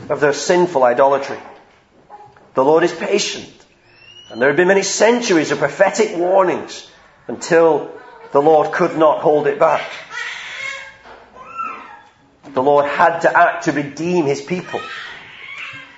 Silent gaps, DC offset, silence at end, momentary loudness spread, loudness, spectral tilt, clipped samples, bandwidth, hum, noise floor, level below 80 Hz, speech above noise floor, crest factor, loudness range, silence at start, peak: none; under 0.1%; 0.15 s; 18 LU; -16 LUFS; -4 dB/octave; under 0.1%; 8 kHz; none; -50 dBFS; -62 dBFS; 35 dB; 18 dB; 5 LU; 0 s; 0 dBFS